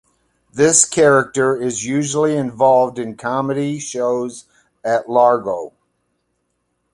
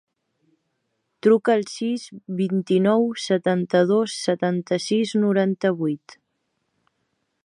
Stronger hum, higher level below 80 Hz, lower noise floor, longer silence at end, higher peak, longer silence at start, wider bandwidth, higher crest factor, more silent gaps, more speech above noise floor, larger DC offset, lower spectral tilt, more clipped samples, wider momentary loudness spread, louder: first, 60 Hz at -60 dBFS vs none; first, -58 dBFS vs -72 dBFS; second, -70 dBFS vs -74 dBFS; second, 1.25 s vs 1.5 s; first, 0 dBFS vs -6 dBFS; second, 0.55 s vs 1.25 s; about the same, 11.5 kHz vs 11.5 kHz; about the same, 18 dB vs 18 dB; neither; about the same, 54 dB vs 53 dB; neither; second, -4 dB/octave vs -6 dB/octave; neither; first, 13 LU vs 8 LU; first, -16 LUFS vs -22 LUFS